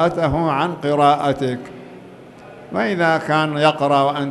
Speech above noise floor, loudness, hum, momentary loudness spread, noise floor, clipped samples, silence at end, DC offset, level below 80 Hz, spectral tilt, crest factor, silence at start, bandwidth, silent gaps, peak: 23 dB; -18 LUFS; none; 14 LU; -40 dBFS; under 0.1%; 0 s; under 0.1%; -46 dBFS; -6.5 dB/octave; 18 dB; 0 s; 12 kHz; none; -2 dBFS